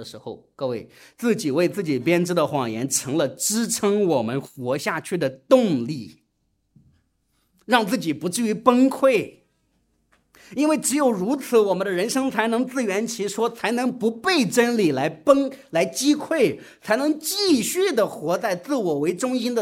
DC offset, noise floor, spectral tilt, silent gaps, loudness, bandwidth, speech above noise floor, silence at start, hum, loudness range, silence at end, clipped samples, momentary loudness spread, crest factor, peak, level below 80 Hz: under 0.1%; -71 dBFS; -4 dB/octave; none; -22 LUFS; 16.5 kHz; 49 dB; 0 s; none; 3 LU; 0 s; under 0.1%; 9 LU; 22 dB; 0 dBFS; -68 dBFS